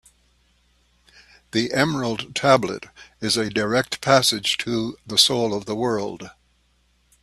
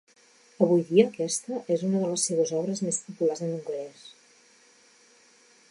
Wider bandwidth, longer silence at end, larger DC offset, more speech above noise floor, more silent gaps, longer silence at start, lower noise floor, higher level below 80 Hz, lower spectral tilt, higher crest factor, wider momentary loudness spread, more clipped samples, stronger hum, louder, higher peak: first, 14 kHz vs 11.5 kHz; second, 0.9 s vs 1.6 s; neither; first, 42 dB vs 33 dB; neither; first, 1.55 s vs 0.6 s; first, -63 dBFS vs -59 dBFS; first, -56 dBFS vs -82 dBFS; second, -3.5 dB/octave vs -5 dB/octave; about the same, 22 dB vs 22 dB; about the same, 13 LU vs 11 LU; neither; first, 60 Hz at -55 dBFS vs none; first, -21 LUFS vs -26 LUFS; first, 0 dBFS vs -6 dBFS